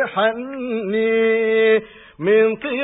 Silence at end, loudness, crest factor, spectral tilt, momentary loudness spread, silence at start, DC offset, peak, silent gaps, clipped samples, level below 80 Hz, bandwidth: 0 s; -18 LUFS; 12 dB; -10 dB/octave; 9 LU; 0 s; under 0.1%; -6 dBFS; none; under 0.1%; -60 dBFS; 4 kHz